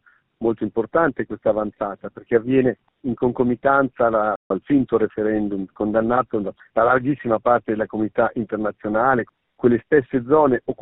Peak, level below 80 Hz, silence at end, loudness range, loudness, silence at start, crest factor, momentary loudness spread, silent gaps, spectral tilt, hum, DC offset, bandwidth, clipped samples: -4 dBFS; -52 dBFS; 0.1 s; 1 LU; -21 LUFS; 0.4 s; 16 dB; 8 LU; 4.36-4.50 s; -7 dB/octave; none; under 0.1%; 4 kHz; under 0.1%